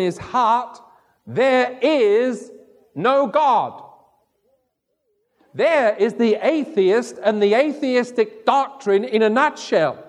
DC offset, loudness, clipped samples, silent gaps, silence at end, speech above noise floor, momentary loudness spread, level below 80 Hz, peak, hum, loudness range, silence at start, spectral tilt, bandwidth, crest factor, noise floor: under 0.1%; -18 LUFS; under 0.1%; none; 0.05 s; 54 dB; 6 LU; -66 dBFS; -4 dBFS; none; 4 LU; 0 s; -5 dB/octave; 11 kHz; 16 dB; -72 dBFS